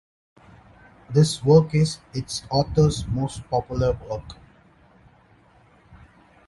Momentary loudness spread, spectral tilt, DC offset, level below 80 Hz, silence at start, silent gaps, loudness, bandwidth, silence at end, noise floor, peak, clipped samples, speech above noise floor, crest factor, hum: 14 LU; -6.5 dB/octave; under 0.1%; -42 dBFS; 1.1 s; none; -22 LUFS; 11.5 kHz; 2.15 s; -55 dBFS; -4 dBFS; under 0.1%; 34 dB; 20 dB; none